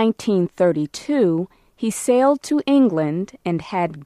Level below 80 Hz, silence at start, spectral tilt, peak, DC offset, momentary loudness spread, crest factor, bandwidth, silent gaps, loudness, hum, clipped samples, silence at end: -60 dBFS; 0 s; -6 dB/octave; -4 dBFS; under 0.1%; 9 LU; 14 dB; 14.5 kHz; none; -20 LUFS; none; under 0.1%; 0 s